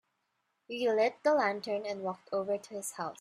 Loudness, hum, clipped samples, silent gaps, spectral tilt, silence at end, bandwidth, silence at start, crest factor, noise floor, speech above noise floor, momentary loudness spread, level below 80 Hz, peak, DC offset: -32 LUFS; none; under 0.1%; none; -3.5 dB/octave; 0.1 s; 14 kHz; 0.7 s; 18 dB; -80 dBFS; 48 dB; 10 LU; -82 dBFS; -16 dBFS; under 0.1%